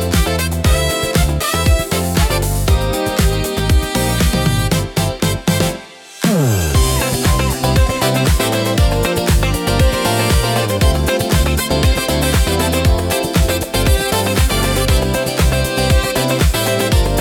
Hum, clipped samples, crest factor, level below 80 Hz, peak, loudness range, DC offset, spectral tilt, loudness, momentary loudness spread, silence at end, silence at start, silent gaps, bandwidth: none; under 0.1%; 12 dB; -20 dBFS; -2 dBFS; 1 LU; under 0.1%; -4.5 dB/octave; -15 LUFS; 2 LU; 0 s; 0 s; none; 18 kHz